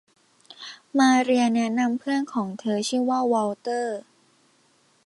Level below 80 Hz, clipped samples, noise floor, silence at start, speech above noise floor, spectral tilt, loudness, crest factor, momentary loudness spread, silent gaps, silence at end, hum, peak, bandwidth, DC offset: -74 dBFS; under 0.1%; -62 dBFS; 0.6 s; 40 dB; -4 dB/octave; -23 LUFS; 16 dB; 14 LU; none; 1.05 s; none; -8 dBFS; 11.5 kHz; under 0.1%